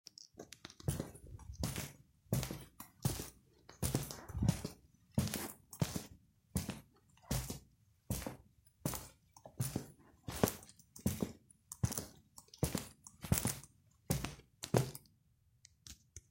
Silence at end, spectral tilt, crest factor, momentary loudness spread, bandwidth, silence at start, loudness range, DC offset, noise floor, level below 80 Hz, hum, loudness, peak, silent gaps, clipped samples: 0.1 s; -5 dB/octave; 30 dB; 19 LU; 16.5 kHz; 0.2 s; 5 LU; under 0.1%; -73 dBFS; -56 dBFS; none; -41 LUFS; -14 dBFS; none; under 0.1%